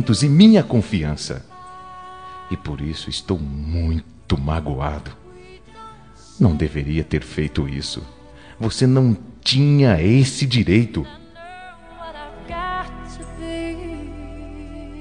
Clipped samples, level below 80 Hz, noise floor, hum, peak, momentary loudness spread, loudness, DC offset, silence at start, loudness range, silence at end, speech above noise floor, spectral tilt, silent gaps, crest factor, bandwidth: under 0.1%; -36 dBFS; -44 dBFS; none; 0 dBFS; 23 LU; -19 LUFS; 0.3%; 0 s; 12 LU; 0 s; 26 dB; -6.5 dB/octave; none; 20 dB; 10 kHz